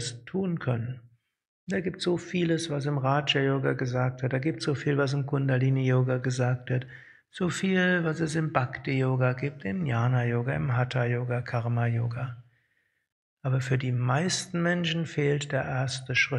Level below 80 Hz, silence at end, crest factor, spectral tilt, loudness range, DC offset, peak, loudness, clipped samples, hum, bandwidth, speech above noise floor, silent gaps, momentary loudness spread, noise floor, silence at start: -62 dBFS; 0 s; 20 dB; -6 dB/octave; 3 LU; under 0.1%; -6 dBFS; -28 LUFS; under 0.1%; none; 11.5 kHz; 46 dB; 1.48-1.67 s, 13.12-13.37 s; 7 LU; -73 dBFS; 0 s